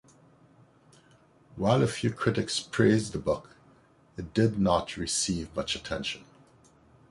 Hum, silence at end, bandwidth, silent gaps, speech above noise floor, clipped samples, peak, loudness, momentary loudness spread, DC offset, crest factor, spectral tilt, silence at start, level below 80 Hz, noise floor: none; 0.9 s; 11.5 kHz; none; 33 dB; under 0.1%; -8 dBFS; -28 LUFS; 10 LU; under 0.1%; 22 dB; -5 dB/octave; 1.55 s; -52 dBFS; -60 dBFS